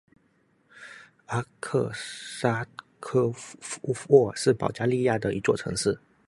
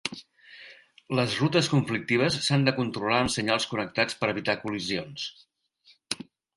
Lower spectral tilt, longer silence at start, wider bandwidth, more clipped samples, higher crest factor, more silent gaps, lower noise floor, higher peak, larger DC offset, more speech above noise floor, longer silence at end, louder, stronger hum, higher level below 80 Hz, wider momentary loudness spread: about the same, -5.5 dB/octave vs -4.5 dB/octave; first, 0.75 s vs 0.05 s; about the same, 11.5 kHz vs 11.5 kHz; neither; about the same, 22 dB vs 20 dB; neither; first, -67 dBFS vs -62 dBFS; about the same, -6 dBFS vs -8 dBFS; neither; first, 41 dB vs 36 dB; about the same, 0.3 s vs 0.4 s; about the same, -27 LUFS vs -27 LUFS; neither; about the same, -60 dBFS vs -58 dBFS; first, 18 LU vs 12 LU